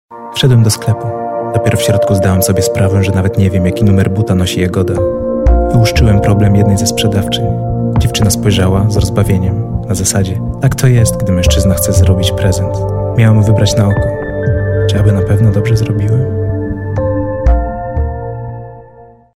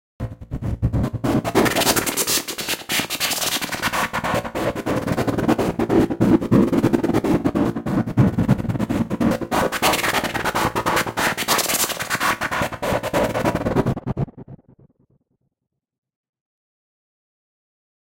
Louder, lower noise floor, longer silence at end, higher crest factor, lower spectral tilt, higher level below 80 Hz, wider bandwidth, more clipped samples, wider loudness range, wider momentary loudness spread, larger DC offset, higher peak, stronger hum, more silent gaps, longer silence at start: first, -12 LUFS vs -20 LUFS; second, -38 dBFS vs -71 dBFS; second, 0.35 s vs 3.5 s; second, 10 dB vs 18 dB; first, -6 dB/octave vs -4.5 dB/octave; first, -22 dBFS vs -40 dBFS; about the same, 16 kHz vs 17 kHz; neither; second, 2 LU vs 6 LU; about the same, 7 LU vs 7 LU; first, 0.8% vs under 0.1%; about the same, 0 dBFS vs -2 dBFS; neither; neither; about the same, 0.1 s vs 0.2 s